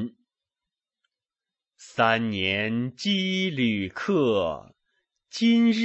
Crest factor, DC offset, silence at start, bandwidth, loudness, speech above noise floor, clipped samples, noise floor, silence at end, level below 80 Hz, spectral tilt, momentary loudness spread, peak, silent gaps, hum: 20 dB; under 0.1%; 0 s; 8.2 kHz; -24 LUFS; over 66 dB; under 0.1%; under -90 dBFS; 0 s; -64 dBFS; -5.5 dB/octave; 12 LU; -8 dBFS; none; none